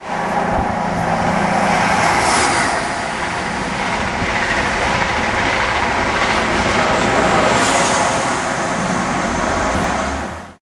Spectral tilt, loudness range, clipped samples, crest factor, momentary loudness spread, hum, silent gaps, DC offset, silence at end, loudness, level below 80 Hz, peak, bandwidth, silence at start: -3.5 dB/octave; 2 LU; under 0.1%; 14 dB; 7 LU; none; none; under 0.1%; 0.1 s; -16 LUFS; -34 dBFS; -2 dBFS; 12.5 kHz; 0 s